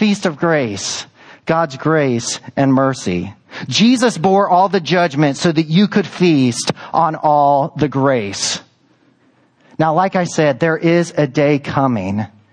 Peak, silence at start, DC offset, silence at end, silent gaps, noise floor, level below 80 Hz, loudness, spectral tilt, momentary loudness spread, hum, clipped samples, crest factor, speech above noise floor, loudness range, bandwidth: 0 dBFS; 0 s; under 0.1%; 0.25 s; none; -55 dBFS; -56 dBFS; -15 LUFS; -5 dB/octave; 9 LU; none; under 0.1%; 14 dB; 40 dB; 3 LU; 10.5 kHz